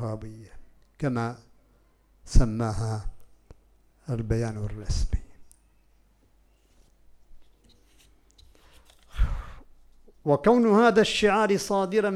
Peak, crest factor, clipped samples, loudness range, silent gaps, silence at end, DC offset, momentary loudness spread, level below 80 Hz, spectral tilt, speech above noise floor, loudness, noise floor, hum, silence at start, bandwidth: -4 dBFS; 24 dB; under 0.1%; 16 LU; none; 0 s; under 0.1%; 23 LU; -34 dBFS; -6 dB/octave; 38 dB; -25 LUFS; -62 dBFS; none; 0 s; 13 kHz